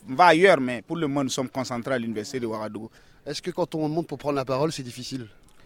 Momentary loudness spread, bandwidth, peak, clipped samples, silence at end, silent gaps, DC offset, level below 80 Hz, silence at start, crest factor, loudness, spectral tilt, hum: 17 LU; 16.5 kHz; -2 dBFS; under 0.1%; 0.35 s; none; under 0.1%; -60 dBFS; 0.05 s; 22 dB; -25 LUFS; -5 dB/octave; none